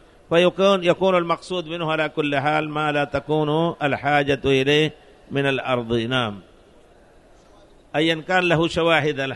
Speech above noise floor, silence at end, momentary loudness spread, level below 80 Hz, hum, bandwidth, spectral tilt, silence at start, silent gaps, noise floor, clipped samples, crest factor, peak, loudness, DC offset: 31 dB; 0 s; 7 LU; -50 dBFS; none; 11.5 kHz; -5.5 dB/octave; 0.3 s; none; -51 dBFS; under 0.1%; 18 dB; -4 dBFS; -21 LUFS; under 0.1%